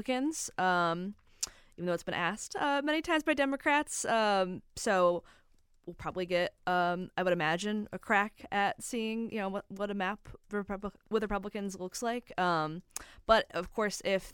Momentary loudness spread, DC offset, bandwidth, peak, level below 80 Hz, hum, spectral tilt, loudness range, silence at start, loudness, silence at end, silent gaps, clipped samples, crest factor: 11 LU; under 0.1%; 18 kHz; -10 dBFS; -58 dBFS; none; -4 dB/octave; 5 LU; 0 s; -32 LUFS; 0 s; none; under 0.1%; 22 dB